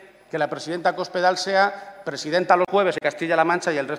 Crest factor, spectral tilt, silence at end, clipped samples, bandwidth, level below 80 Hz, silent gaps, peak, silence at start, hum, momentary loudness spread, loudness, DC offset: 18 dB; -4 dB/octave; 0 s; under 0.1%; 12 kHz; -68 dBFS; none; -4 dBFS; 0 s; none; 10 LU; -22 LUFS; under 0.1%